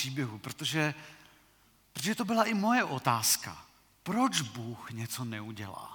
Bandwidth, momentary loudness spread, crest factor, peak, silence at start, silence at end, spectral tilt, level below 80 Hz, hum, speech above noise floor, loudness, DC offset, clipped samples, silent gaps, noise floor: 19 kHz; 17 LU; 22 dB; -10 dBFS; 0 s; 0 s; -3.5 dB/octave; -72 dBFS; none; 33 dB; -31 LUFS; under 0.1%; under 0.1%; none; -65 dBFS